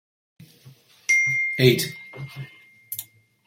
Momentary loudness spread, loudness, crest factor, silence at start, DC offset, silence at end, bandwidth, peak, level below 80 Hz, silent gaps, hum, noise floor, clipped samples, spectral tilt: 19 LU; -21 LUFS; 22 dB; 0.65 s; under 0.1%; 0.45 s; 16.5 kHz; -4 dBFS; -62 dBFS; none; none; -51 dBFS; under 0.1%; -4 dB/octave